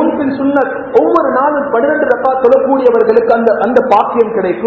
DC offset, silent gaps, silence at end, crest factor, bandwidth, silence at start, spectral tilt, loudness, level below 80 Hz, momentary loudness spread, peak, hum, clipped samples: under 0.1%; none; 0 s; 10 dB; 6 kHz; 0 s; -8 dB/octave; -11 LUFS; -50 dBFS; 3 LU; 0 dBFS; none; 0.8%